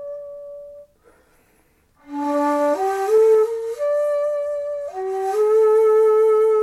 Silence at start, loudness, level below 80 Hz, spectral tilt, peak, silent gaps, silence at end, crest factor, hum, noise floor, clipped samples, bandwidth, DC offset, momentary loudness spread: 0 s; -18 LUFS; -64 dBFS; -4 dB/octave; -8 dBFS; none; 0 s; 12 dB; none; -59 dBFS; under 0.1%; 13 kHz; under 0.1%; 19 LU